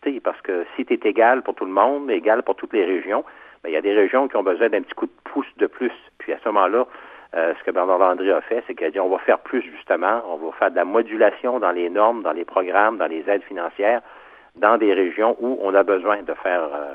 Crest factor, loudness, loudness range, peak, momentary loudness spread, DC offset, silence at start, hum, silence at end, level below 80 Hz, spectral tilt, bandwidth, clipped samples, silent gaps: 20 dB; -21 LUFS; 2 LU; 0 dBFS; 9 LU; under 0.1%; 0 s; none; 0 s; -68 dBFS; -7 dB/octave; 4.1 kHz; under 0.1%; none